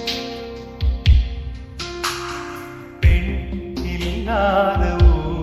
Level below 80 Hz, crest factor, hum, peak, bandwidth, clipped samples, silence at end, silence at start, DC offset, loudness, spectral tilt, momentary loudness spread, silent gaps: -22 dBFS; 16 dB; none; -2 dBFS; 13.5 kHz; under 0.1%; 0 s; 0 s; under 0.1%; -20 LUFS; -6 dB/octave; 15 LU; none